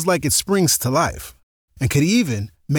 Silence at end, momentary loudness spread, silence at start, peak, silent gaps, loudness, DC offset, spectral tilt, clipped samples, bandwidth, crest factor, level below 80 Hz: 0 s; 11 LU; 0 s; -6 dBFS; 1.43-1.68 s; -18 LUFS; under 0.1%; -4.5 dB/octave; under 0.1%; over 20 kHz; 14 dB; -42 dBFS